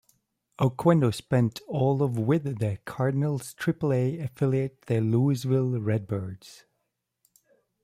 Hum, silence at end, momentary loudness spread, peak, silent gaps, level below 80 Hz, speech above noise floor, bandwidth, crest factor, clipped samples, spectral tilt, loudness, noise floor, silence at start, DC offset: none; 1.3 s; 7 LU; -8 dBFS; none; -62 dBFS; 54 dB; 15 kHz; 18 dB; under 0.1%; -8 dB/octave; -26 LUFS; -80 dBFS; 0.6 s; under 0.1%